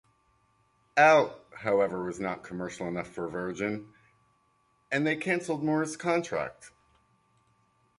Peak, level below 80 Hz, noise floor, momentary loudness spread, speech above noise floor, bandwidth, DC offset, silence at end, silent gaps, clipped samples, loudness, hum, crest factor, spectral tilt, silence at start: -8 dBFS; -66 dBFS; -70 dBFS; 14 LU; 42 dB; 11.5 kHz; under 0.1%; 1.3 s; none; under 0.1%; -29 LUFS; none; 22 dB; -5.5 dB/octave; 0.95 s